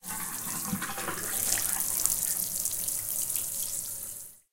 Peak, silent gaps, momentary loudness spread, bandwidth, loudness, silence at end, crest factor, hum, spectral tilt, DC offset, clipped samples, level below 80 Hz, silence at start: -2 dBFS; none; 8 LU; 17 kHz; -29 LUFS; 0.15 s; 30 dB; none; -1 dB/octave; under 0.1%; under 0.1%; -56 dBFS; 0.05 s